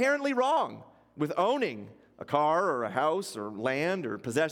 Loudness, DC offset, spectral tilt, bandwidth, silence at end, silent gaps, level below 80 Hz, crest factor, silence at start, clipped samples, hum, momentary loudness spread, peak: -29 LUFS; under 0.1%; -5 dB/octave; 17 kHz; 0 s; none; -76 dBFS; 18 dB; 0 s; under 0.1%; none; 10 LU; -10 dBFS